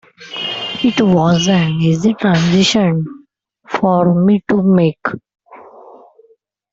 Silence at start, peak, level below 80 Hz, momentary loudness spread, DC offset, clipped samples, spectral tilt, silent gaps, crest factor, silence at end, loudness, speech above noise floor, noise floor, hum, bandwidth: 0.2 s; -2 dBFS; -50 dBFS; 12 LU; under 0.1%; under 0.1%; -6 dB/octave; none; 12 dB; 1.15 s; -14 LUFS; 41 dB; -54 dBFS; none; 8 kHz